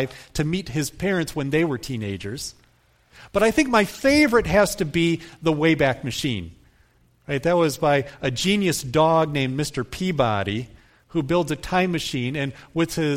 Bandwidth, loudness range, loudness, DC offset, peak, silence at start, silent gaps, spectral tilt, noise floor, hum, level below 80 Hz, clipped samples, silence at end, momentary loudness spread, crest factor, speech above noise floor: 16.5 kHz; 5 LU; -22 LUFS; under 0.1%; -4 dBFS; 0 s; none; -5 dB/octave; -59 dBFS; none; -46 dBFS; under 0.1%; 0 s; 11 LU; 18 dB; 37 dB